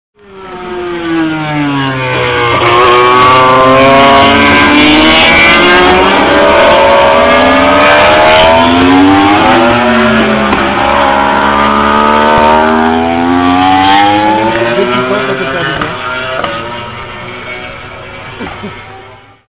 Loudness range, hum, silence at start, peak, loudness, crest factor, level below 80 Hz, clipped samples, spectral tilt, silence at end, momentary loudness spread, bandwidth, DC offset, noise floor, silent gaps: 11 LU; none; 0.3 s; 0 dBFS; -6 LUFS; 8 dB; -30 dBFS; under 0.1%; -8.5 dB/octave; 0.4 s; 17 LU; 4 kHz; 0.6%; -33 dBFS; none